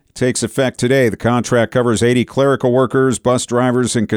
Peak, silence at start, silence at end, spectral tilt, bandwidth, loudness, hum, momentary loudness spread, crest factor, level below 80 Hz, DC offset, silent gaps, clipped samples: -4 dBFS; 0.15 s; 0 s; -5.5 dB/octave; 16.5 kHz; -15 LUFS; none; 3 LU; 12 dB; -48 dBFS; under 0.1%; none; under 0.1%